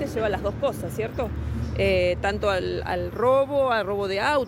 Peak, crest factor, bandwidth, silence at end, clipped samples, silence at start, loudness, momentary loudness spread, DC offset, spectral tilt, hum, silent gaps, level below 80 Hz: -10 dBFS; 14 dB; 16 kHz; 0 s; under 0.1%; 0 s; -25 LUFS; 8 LU; under 0.1%; -6 dB/octave; none; none; -38 dBFS